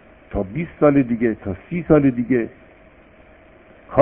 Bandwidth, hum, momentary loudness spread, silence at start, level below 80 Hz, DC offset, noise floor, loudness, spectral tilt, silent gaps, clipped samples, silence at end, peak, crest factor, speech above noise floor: 3.5 kHz; none; 12 LU; 0.3 s; -42 dBFS; under 0.1%; -48 dBFS; -20 LUFS; -13 dB/octave; none; under 0.1%; 0 s; 0 dBFS; 20 dB; 30 dB